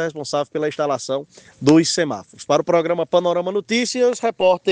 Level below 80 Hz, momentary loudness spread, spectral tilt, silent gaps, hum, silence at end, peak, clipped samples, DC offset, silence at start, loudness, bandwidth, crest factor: -62 dBFS; 9 LU; -4.5 dB/octave; none; none; 0 s; 0 dBFS; under 0.1%; under 0.1%; 0 s; -19 LUFS; 10 kHz; 18 dB